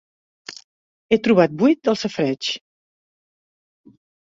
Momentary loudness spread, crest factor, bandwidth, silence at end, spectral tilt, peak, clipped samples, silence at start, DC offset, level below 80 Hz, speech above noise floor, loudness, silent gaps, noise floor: 22 LU; 20 dB; 7.8 kHz; 1.65 s; -5.5 dB/octave; -2 dBFS; under 0.1%; 0.5 s; under 0.1%; -62 dBFS; over 72 dB; -19 LUFS; 0.64-1.09 s; under -90 dBFS